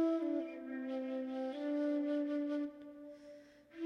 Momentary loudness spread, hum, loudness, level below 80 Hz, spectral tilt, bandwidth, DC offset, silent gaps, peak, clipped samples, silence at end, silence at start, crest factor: 19 LU; none; -39 LUFS; -84 dBFS; -5.5 dB/octave; 6.4 kHz; under 0.1%; none; -26 dBFS; under 0.1%; 0 s; 0 s; 14 dB